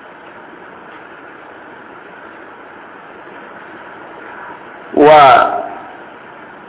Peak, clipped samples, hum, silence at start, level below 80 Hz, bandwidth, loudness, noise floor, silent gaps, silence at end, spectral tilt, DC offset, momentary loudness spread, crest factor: 0 dBFS; 0.4%; none; 4.3 s; -56 dBFS; 4 kHz; -8 LUFS; -35 dBFS; none; 0.8 s; -8.5 dB/octave; under 0.1%; 27 LU; 16 dB